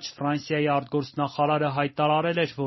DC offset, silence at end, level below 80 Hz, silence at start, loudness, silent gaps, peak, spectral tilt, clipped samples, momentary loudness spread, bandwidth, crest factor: under 0.1%; 0 s; -66 dBFS; 0 s; -25 LUFS; none; -10 dBFS; -4.5 dB/octave; under 0.1%; 5 LU; 6.2 kHz; 16 dB